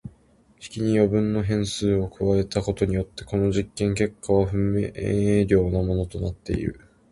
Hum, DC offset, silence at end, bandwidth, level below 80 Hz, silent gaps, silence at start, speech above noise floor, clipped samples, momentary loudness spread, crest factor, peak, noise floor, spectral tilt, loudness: none; under 0.1%; 0.35 s; 11.5 kHz; -38 dBFS; none; 0.05 s; 35 dB; under 0.1%; 8 LU; 18 dB; -6 dBFS; -57 dBFS; -7 dB/octave; -24 LUFS